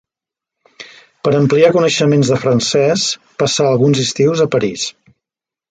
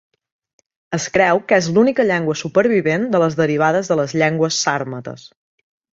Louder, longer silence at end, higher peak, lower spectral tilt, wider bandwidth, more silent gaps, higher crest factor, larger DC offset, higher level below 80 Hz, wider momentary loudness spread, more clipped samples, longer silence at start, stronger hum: first, -14 LUFS vs -17 LUFS; first, 0.8 s vs 0.65 s; about the same, 0 dBFS vs -2 dBFS; about the same, -5 dB/octave vs -5 dB/octave; first, 9.4 kHz vs 8 kHz; neither; about the same, 14 dB vs 16 dB; neither; about the same, -54 dBFS vs -58 dBFS; second, 8 LU vs 11 LU; neither; about the same, 0.8 s vs 0.9 s; neither